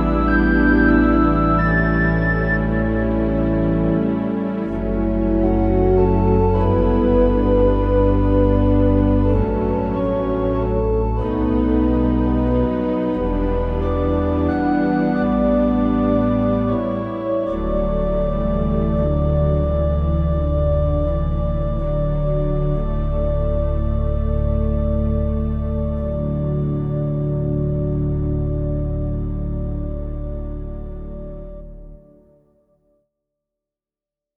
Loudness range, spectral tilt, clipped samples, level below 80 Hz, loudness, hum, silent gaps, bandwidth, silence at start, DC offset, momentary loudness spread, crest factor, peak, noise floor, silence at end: 8 LU; -11 dB/octave; under 0.1%; -24 dBFS; -19 LUFS; none; none; 5.6 kHz; 0 s; under 0.1%; 7 LU; 16 dB; -2 dBFS; -89 dBFS; 2.45 s